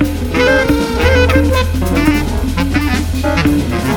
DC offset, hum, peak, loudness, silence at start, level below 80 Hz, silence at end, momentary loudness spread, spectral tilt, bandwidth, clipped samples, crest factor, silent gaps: under 0.1%; none; 0 dBFS; -13 LUFS; 0 s; -20 dBFS; 0 s; 5 LU; -6 dB/octave; 19 kHz; under 0.1%; 12 dB; none